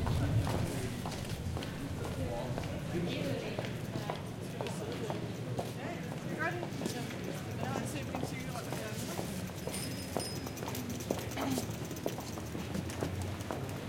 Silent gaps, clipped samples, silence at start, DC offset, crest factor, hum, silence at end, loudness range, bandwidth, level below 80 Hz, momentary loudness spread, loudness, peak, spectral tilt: none; under 0.1%; 0 s; under 0.1%; 22 dB; none; 0 s; 1 LU; 17 kHz; -54 dBFS; 4 LU; -38 LUFS; -16 dBFS; -5.5 dB/octave